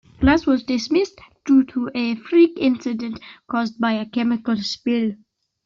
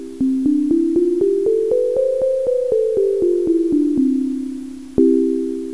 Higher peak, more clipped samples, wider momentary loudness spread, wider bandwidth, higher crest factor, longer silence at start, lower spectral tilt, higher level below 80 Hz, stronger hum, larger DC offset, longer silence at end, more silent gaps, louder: second, -6 dBFS vs -2 dBFS; neither; first, 10 LU vs 6 LU; second, 7.4 kHz vs 11 kHz; about the same, 16 dB vs 14 dB; first, 0.2 s vs 0 s; second, -5.5 dB/octave vs -8 dB/octave; first, -42 dBFS vs -48 dBFS; neither; second, under 0.1% vs 0.7%; first, 0.5 s vs 0 s; neither; second, -20 LUFS vs -17 LUFS